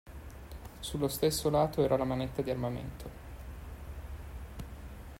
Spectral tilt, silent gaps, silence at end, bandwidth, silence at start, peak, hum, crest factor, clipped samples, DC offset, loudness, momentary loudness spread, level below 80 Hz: -5.5 dB/octave; none; 0 s; 16 kHz; 0.05 s; -16 dBFS; none; 20 dB; under 0.1%; under 0.1%; -32 LUFS; 19 LU; -48 dBFS